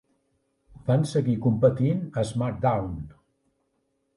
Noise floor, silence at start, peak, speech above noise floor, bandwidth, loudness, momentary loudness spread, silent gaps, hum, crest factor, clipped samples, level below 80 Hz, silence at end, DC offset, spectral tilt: -74 dBFS; 0.85 s; -6 dBFS; 50 dB; 11.5 kHz; -25 LUFS; 13 LU; none; none; 20 dB; under 0.1%; -50 dBFS; 1.05 s; under 0.1%; -8 dB/octave